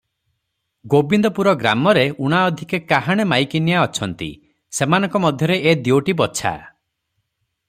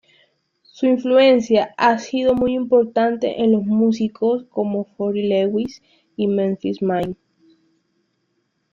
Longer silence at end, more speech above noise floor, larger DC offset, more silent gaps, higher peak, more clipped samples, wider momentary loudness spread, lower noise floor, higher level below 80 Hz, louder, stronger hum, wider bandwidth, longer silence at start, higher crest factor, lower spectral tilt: second, 1 s vs 1.6 s; first, 57 dB vs 51 dB; neither; neither; about the same, -2 dBFS vs -4 dBFS; neither; about the same, 9 LU vs 9 LU; first, -74 dBFS vs -69 dBFS; about the same, -54 dBFS vs -56 dBFS; about the same, -17 LUFS vs -19 LUFS; neither; first, 15.5 kHz vs 7.2 kHz; about the same, 0.85 s vs 0.75 s; about the same, 18 dB vs 16 dB; second, -5 dB/octave vs -6.5 dB/octave